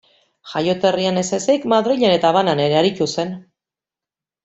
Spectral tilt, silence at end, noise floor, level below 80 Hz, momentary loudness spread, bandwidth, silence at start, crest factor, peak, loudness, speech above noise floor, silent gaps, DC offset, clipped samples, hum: -5 dB/octave; 1.05 s; -89 dBFS; -60 dBFS; 10 LU; 8.2 kHz; 0.45 s; 16 dB; -2 dBFS; -18 LUFS; 72 dB; none; under 0.1%; under 0.1%; none